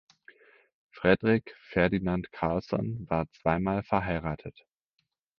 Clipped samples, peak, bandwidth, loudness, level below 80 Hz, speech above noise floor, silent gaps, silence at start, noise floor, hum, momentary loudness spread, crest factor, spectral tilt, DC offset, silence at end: under 0.1%; -6 dBFS; 6.4 kHz; -29 LUFS; -50 dBFS; 51 dB; none; 0.95 s; -80 dBFS; none; 8 LU; 24 dB; -9 dB/octave; under 0.1%; 0.9 s